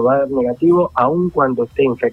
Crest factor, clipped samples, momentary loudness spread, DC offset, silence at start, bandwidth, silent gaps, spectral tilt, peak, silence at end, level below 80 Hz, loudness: 14 dB; under 0.1%; 3 LU; under 0.1%; 0 s; 4.2 kHz; none; -9.5 dB/octave; -2 dBFS; 0 s; -48 dBFS; -16 LUFS